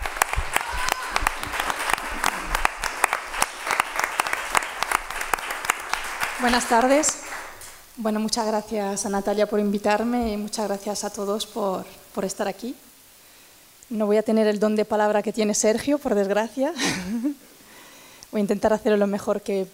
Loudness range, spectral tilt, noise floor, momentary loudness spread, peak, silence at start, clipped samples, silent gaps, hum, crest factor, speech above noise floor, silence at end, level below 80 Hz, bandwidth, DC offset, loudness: 4 LU; -3.5 dB/octave; -51 dBFS; 9 LU; 0 dBFS; 0 s; under 0.1%; none; none; 24 dB; 28 dB; 0.05 s; -42 dBFS; 17.5 kHz; under 0.1%; -24 LUFS